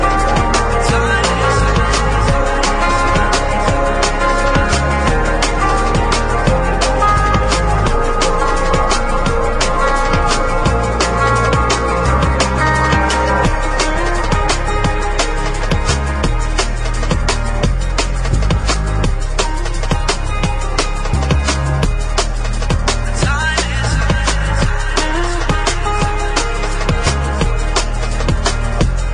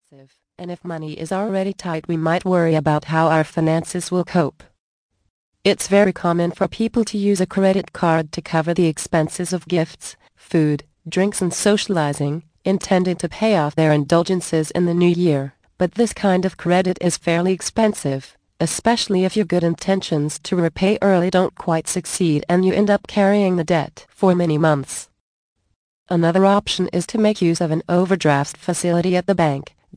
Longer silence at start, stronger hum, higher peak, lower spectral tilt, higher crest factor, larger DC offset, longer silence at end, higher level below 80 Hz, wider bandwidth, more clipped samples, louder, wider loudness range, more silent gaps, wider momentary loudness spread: second, 0 s vs 0.6 s; neither; about the same, 0 dBFS vs -2 dBFS; about the same, -4.5 dB/octave vs -5.5 dB/octave; about the same, 14 dB vs 18 dB; first, 1% vs under 0.1%; second, 0 s vs 0.3 s; first, -18 dBFS vs -52 dBFS; about the same, 10.5 kHz vs 10.5 kHz; neither; first, -15 LUFS vs -19 LUFS; about the same, 4 LU vs 2 LU; second, none vs 4.79-5.09 s, 5.30-5.52 s, 25.20-25.56 s, 25.76-26.06 s; second, 5 LU vs 8 LU